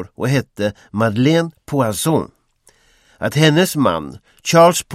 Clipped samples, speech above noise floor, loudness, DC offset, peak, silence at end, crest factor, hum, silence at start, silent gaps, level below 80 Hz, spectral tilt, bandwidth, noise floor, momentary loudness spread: under 0.1%; 40 dB; -17 LUFS; under 0.1%; 0 dBFS; 0 s; 18 dB; none; 0 s; none; -52 dBFS; -5 dB/octave; 16 kHz; -56 dBFS; 13 LU